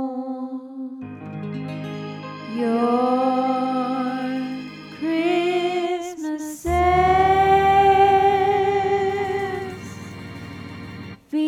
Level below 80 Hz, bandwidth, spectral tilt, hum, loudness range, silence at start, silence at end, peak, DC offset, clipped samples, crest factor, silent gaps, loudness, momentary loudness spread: -42 dBFS; 14.5 kHz; -6 dB/octave; none; 7 LU; 0 s; 0 s; -6 dBFS; under 0.1%; under 0.1%; 16 dB; none; -21 LUFS; 20 LU